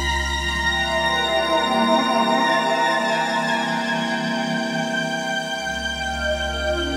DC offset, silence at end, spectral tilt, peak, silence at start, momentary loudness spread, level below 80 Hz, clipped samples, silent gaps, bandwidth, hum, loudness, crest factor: under 0.1%; 0 s; -3.5 dB/octave; -6 dBFS; 0 s; 6 LU; -36 dBFS; under 0.1%; none; 16 kHz; none; -21 LUFS; 16 dB